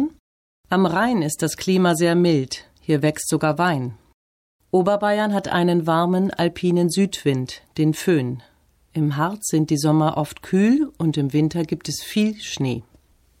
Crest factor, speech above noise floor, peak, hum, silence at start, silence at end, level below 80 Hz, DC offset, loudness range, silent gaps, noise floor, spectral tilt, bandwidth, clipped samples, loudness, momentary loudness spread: 14 dB; 36 dB; -8 dBFS; none; 0 s; 0.6 s; -56 dBFS; under 0.1%; 2 LU; 0.19-0.64 s, 4.14-4.60 s; -56 dBFS; -5.5 dB/octave; 16.5 kHz; under 0.1%; -21 LUFS; 8 LU